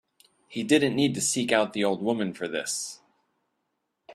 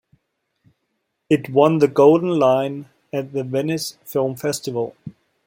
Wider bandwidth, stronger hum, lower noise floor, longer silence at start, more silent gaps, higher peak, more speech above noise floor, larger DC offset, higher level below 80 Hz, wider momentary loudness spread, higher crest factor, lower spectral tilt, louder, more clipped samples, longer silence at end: second, 14 kHz vs 16.5 kHz; neither; first, -79 dBFS vs -74 dBFS; second, 0.5 s vs 1.3 s; neither; second, -6 dBFS vs -2 dBFS; about the same, 53 dB vs 56 dB; neither; about the same, -68 dBFS vs -64 dBFS; second, 10 LU vs 14 LU; about the same, 22 dB vs 18 dB; second, -3.5 dB/octave vs -6 dB/octave; second, -26 LUFS vs -19 LUFS; neither; second, 0 s vs 0.35 s